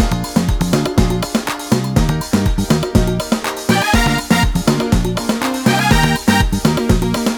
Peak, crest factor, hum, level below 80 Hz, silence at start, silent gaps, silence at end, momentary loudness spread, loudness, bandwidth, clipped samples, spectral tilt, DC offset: 0 dBFS; 14 dB; none; -22 dBFS; 0 s; none; 0 s; 5 LU; -16 LUFS; over 20 kHz; under 0.1%; -5 dB/octave; under 0.1%